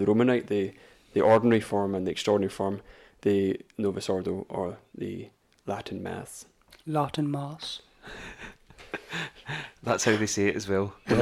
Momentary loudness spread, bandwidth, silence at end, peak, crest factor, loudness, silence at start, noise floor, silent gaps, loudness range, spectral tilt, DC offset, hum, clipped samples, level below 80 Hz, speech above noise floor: 18 LU; 14 kHz; 0 s; -10 dBFS; 18 dB; -28 LUFS; 0 s; -47 dBFS; none; 8 LU; -5 dB/octave; under 0.1%; none; under 0.1%; -58 dBFS; 20 dB